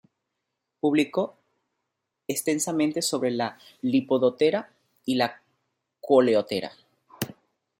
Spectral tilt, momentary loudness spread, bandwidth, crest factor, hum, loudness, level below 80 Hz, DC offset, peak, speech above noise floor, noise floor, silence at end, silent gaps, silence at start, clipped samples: -4 dB/octave; 14 LU; 16.5 kHz; 20 dB; none; -25 LUFS; -72 dBFS; under 0.1%; -6 dBFS; 58 dB; -82 dBFS; 0.5 s; none; 0.85 s; under 0.1%